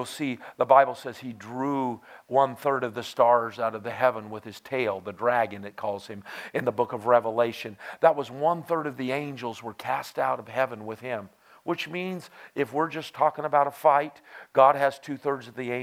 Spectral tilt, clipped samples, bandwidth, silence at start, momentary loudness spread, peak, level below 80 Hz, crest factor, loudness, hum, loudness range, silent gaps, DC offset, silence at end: -5.5 dB/octave; under 0.1%; 16 kHz; 0 s; 16 LU; -4 dBFS; -78 dBFS; 22 dB; -26 LUFS; none; 6 LU; none; under 0.1%; 0 s